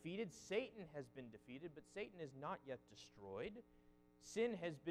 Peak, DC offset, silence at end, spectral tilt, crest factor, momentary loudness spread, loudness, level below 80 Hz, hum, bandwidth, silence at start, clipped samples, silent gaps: -30 dBFS; under 0.1%; 0 s; -5 dB/octave; 20 dB; 14 LU; -50 LUFS; -78 dBFS; 60 Hz at -75 dBFS; 14 kHz; 0 s; under 0.1%; none